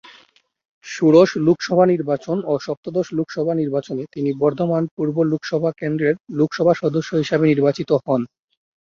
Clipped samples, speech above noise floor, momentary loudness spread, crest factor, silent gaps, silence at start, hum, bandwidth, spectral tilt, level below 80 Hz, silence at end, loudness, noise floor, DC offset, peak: under 0.1%; 37 dB; 8 LU; 18 dB; 2.77-2.83 s, 4.91-4.97 s, 6.20-6.24 s; 0.85 s; none; 7.4 kHz; -7 dB/octave; -62 dBFS; 0.55 s; -19 LUFS; -55 dBFS; under 0.1%; -2 dBFS